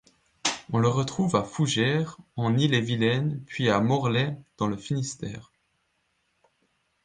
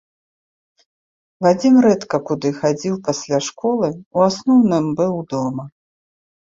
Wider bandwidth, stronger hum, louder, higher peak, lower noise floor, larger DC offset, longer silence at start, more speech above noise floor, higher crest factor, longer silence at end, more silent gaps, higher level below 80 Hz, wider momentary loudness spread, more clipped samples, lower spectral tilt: first, 9.8 kHz vs 7.6 kHz; neither; second, -26 LUFS vs -18 LUFS; second, -8 dBFS vs -2 dBFS; second, -73 dBFS vs under -90 dBFS; neither; second, 0.45 s vs 1.4 s; second, 48 dB vs over 73 dB; about the same, 18 dB vs 16 dB; first, 1.65 s vs 0.8 s; second, none vs 4.06-4.11 s; about the same, -60 dBFS vs -60 dBFS; about the same, 8 LU vs 10 LU; neither; about the same, -5.5 dB/octave vs -6 dB/octave